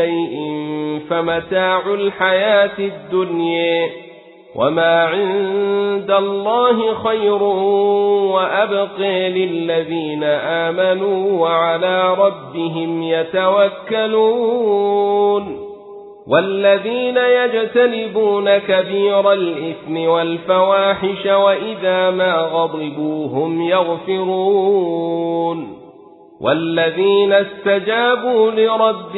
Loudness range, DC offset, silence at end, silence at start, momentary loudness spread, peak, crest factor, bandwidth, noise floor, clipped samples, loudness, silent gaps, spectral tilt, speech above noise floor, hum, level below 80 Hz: 2 LU; under 0.1%; 0 s; 0 s; 8 LU; 0 dBFS; 16 dB; 4.1 kHz; -43 dBFS; under 0.1%; -16 LUFS; none; -10.5 dB/octave; 27 dB; none; -60 dBFS